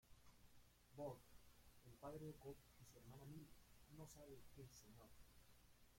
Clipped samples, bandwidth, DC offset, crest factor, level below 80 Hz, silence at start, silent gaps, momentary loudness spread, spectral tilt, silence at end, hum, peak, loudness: under 0.1%; 16.5 kHz; under 0.1%; 20 dB; -74 dBFS; 0.05 s; none; 12 LU; -5.5 dB/octave; 0 s; 60 Hz at -75 dBFS; -42 dBFS; -61 LUFS